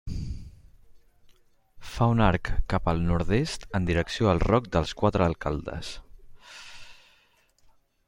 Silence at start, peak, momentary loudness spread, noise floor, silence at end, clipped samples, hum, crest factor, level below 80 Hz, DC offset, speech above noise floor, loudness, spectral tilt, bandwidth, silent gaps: 0.05 s; -6 dBFS; 21 LU; -63 dBFS; 1.15 s; under 0.1%; none; 22 dB; -38 dBFS; under 0.1%; 39 dB; -26 LUFS; -6.5 dB/octave; 16 kHz; none